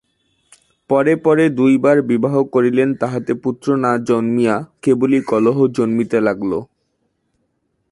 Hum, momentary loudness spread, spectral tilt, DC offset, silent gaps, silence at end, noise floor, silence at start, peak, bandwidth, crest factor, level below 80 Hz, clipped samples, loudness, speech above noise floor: none; 7 LU; -7.5 dB/octave; under 0.1%; none; 1.25 s; -68 dBFS; 0.9 s; -2 dBFS; 11.5 kHz; 14 dB; -58 dBFS; under 0.1%; -16 LUFS; 52 dB